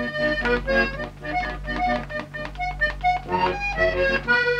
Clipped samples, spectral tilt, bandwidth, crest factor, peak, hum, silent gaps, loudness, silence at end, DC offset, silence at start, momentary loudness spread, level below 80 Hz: under 0.1%; -5.5 dB/octave; 12.5 kHz; 16 dB; -8 dBFS; none; none; -24 LUFS; 0 s; under 0.1%; 0 s; 9 LU; -36 dBFS